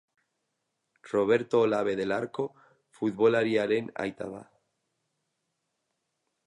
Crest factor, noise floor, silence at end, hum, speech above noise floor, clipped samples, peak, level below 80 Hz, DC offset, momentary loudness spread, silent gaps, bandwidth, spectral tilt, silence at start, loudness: 20 dB; -81 dBFS; 2.05 s; none; 54 dB; under 0.1%; -12 dBFS; -72 dBFS; under 0.1%; 12 LU; none; 10.5 kHz; -6.5 dB/octave; 1.05 s; -28 LUFS